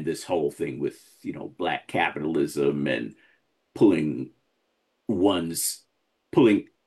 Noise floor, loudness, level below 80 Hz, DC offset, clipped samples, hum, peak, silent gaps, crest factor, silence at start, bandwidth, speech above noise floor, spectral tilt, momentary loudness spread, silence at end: -73 dBFS; -25 LUFS; -66 dBFS; under 0.1%; under 0.1%; none; -8 dBFS; none; 18 dB; 0 s; 13 kHz; 49 dB; -5 dB/octave; 17 LU; 0.25 s